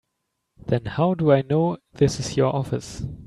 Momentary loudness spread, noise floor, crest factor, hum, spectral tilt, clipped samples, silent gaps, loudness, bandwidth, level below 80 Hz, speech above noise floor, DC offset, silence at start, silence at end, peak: 10 LU; -77 dBFS; 16 dB; none; -6.5 dB/octave; under 0.1%; none; -22 LUFS; 12 kHz; -48 dBFS; 56 dB; under 0.1%; 0.65 s; 0 s; -6 dBFS